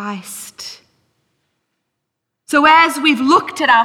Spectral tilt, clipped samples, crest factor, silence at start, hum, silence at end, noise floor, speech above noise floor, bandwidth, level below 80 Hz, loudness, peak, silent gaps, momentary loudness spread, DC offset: -2.5 dB/octave; under 0.1%; 16 dB; 0 s; none; 0 s; -77 dBFS; 63 dB; 16.5 kHz; -60 dBFS; -12 LUFS; -2 dBFS; none; 20 LU; under 0.1%